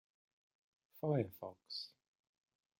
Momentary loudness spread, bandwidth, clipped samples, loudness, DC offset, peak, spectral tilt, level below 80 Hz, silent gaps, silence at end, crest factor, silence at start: 13 LU; 16.5 kHz; under 0.1%; -42 LUFS; under 0.1%; -22 dBFS; -8 dB/octave; -86 dBFS; none; 0.95 s; 22 dB; 0.95 s